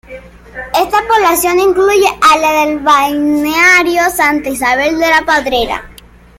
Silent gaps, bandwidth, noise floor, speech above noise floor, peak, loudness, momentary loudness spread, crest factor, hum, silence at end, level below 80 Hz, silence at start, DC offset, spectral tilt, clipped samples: none; 17 kHz; -33 dBFS; 22 dB; 0 dBFS; -10 LUFS; 8 LU; 12 dB; none; 0.45 s; -38 dBFS; 0.1 s; under 0.1%; -2.5 dB/octave; under 0.1%